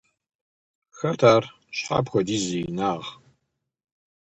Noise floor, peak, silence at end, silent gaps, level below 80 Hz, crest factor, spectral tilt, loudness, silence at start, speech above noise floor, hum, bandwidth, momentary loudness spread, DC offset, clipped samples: -77 dBFS; -4 dBFS; 1.2 s; none; -58 dBFS; 22 dB; -5 dB/octave; -24 LUFS; 0.95 s; 54 dB; none; 8.8 kHz; 14 LU; under 0.1%; under 0.1%